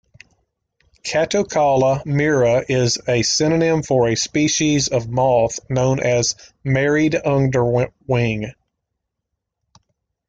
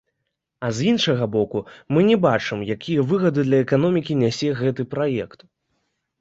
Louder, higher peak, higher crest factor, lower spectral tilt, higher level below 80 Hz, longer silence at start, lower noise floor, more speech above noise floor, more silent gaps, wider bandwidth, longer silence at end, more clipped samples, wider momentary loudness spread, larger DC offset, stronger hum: first, -18 LUFS vs -21 LUFS; about the same, -4 dBFS vs -4 dBFS; about the same, 14 dB vs 18 dB; second, -4.5 dB/octave vs -6.5 dB/octave; first, -48 dBFS vs -58 dBFS; first, 1.05 s vs 0.6 s; about the same, -79 dBFS vs -78 dBFS; about the same, 61 dB vs 58 dB; neither; first, 9.4 kHz vs 8 kHz; first, 1.75 s vs 0.95 s; neither; second, 5 LU vs 9 LU; neither; neither